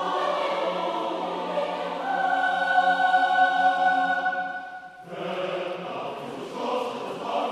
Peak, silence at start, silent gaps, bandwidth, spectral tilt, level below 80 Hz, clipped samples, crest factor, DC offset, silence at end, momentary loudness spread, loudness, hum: -10 dBFS; 0 s; none; 11.5 kHz; -4 dB/octave; -74 dBFS; under 0.1%; 16 dB; under 0.1%; 0 s; 13 LU; -25 LUFS; none